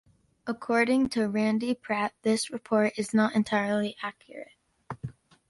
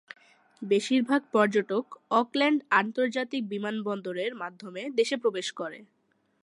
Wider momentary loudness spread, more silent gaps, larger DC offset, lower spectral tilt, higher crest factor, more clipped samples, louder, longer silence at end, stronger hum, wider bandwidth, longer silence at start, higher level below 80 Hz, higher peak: first, 17 LU vs 12 LU; neither; neither; about the same, -5 dB/octave vs -4.5 dB/octave; about the same, 18 dB vs 20 dB; neither; about the same, -27 LUFS vs -28 LUFS; second, 0.4 s vs 0.6 s; neither; about the same, 11.5 kHz vs 11.5 kHz; second, 0.45 s vs 0.6 s; first, -64 dBFS vs -84 dBFS; second, -12 dBFS vs -8 dBFS